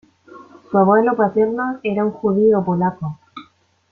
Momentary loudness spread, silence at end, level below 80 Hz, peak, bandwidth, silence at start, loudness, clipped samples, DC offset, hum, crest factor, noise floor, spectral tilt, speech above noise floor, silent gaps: 10 LU; 0.5 s; -58 dBFS; -2 dBFS; 4.3 kHz; 0.35 s; -17 LUFS; under 0.1%; under 0.1%; none; 16 dB; -52 dBFS; -10 dB/octave; 36 dB; none